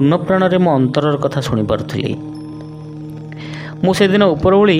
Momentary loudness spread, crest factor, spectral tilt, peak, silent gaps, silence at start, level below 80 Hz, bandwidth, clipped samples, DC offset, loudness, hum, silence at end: 18 LU; 14 dB; -7 dB/octave; 0 dBFS; none; 0 s; -42 dBFS; 15.5 kHz; under 0.1%; under 0.1%; -15 LUFS; none; 0 s